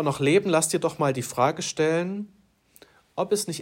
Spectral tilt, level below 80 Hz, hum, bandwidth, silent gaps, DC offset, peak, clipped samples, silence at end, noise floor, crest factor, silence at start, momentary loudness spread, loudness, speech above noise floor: -4.5 dB/octave; -68 dBFS; none; 16 kHz; none; under 0.1%; -6 dBFS; under 0.1%; 0 s; -56 dBFS; 18 dB; 0 s; 12 LU; -24 LUFS; 32 dB